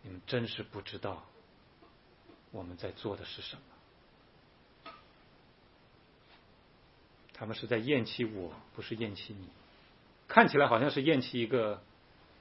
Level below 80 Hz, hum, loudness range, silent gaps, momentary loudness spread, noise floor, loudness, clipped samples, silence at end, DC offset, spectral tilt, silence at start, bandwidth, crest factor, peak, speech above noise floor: -68 dBFS; none; 17 LU; none; 23 LU; -63 dBFS; -32 LUFS; under 0.1%; 0.6 s; under 0.1%; -3.5 dB/octave; 0.05 s; 5.8 kHz; 32 dB; -4 dBFS; 30 dB